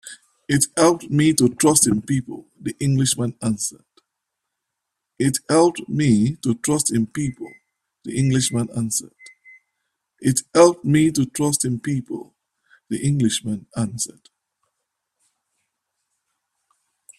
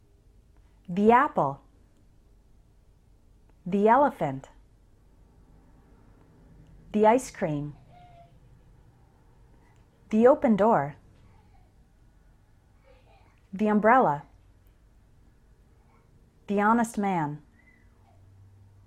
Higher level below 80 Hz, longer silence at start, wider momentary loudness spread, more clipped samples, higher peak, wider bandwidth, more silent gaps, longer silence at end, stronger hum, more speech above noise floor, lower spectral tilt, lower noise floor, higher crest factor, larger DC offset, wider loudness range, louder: about the same, -54 dBFS vs -58 dBFS; second, 0.05 s vs 0.9 s; about the same, 14 LU vs 15 LU; neither; first, 0 dBFS vs -8 dBFS; about the same, 14 kHz vs 13 kHz; neither; first, 3.1 s vs 1.5 s; neither; first, 61 dB vs 36 dB; second, -5 dB/octave vs -7 dB/octave; first, -81 dBFS vs -59 dBFS; about the same, 20 dB vs 20 dB; neither; first, 8 LU vs 4 LU; first, -20 LUFS vs -24 LUFS